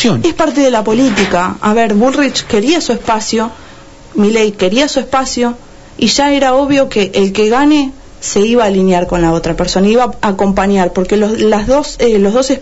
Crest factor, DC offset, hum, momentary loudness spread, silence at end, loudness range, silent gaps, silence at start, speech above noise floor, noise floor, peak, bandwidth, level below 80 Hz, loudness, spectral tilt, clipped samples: 10 dB; under 0.1%; none; 5 LU; 0 s; 2 LU; none; 0 s; 24 dB; -35 dBFS; -2 dBFS; 8 kHz; -32 dBFS; -11 LUFS; -4.5 dB/octave; under 0.1%